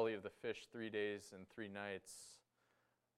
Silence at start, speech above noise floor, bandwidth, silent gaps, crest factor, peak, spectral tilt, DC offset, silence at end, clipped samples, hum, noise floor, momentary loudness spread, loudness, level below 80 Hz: 0 s; 34 dB; 14.5 kHz; none; 20 dB; -28 dBFS; -4 dB/octave; under 0.1%; 0.8 s; under 0.1%; none; -82 dBFS; 13 LU; -48 LUFS; -88 dBFS